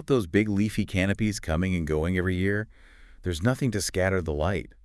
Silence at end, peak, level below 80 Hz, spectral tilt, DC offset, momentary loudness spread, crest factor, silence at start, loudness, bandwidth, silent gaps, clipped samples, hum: 0.15 s; -8 dBFS; -44 dBFS; -6 dB/octave; under 0.1%; 5 LU; 18 dB; 0 s; -27 LUFS; 12 kHz; none; under 0.1%; none